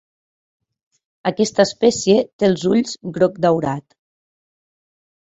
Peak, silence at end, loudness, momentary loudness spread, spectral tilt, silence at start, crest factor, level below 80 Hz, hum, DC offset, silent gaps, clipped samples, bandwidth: -2 dBFS; 1.4 s; -18 LUFS; 10 LU; -5 dB/octave; 1.25 s; 18 dB; -58 dBFS; none; under 0.1%; 2.33-2.39 s; under 0.1%; 8.2 kHz